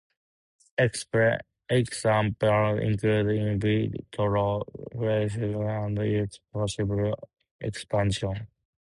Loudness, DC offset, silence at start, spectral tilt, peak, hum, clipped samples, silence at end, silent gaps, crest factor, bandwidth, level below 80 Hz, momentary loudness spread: -27 LUFS; under 0.1%; 0.8 s; -6.5 dB/octave; -12 dBFS; none; under 0.1%; 0.4 s; 7.51-7.59 s; 16 dB; 11.5 kHz; -50 dBFS; 10 LU